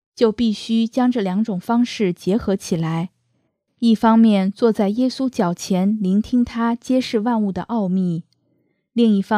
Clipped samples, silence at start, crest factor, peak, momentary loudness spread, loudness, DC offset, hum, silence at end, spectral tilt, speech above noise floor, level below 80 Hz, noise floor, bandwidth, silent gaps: under 0.1%; 0.2 s; 16 dB; -2 dBFS; 6 LU; -19 LUFS; under 0.1%; none; 0 s; -6.5 dB/octave; 50 dB; -52 dBFS; -68 dBFS; 13 kHz; none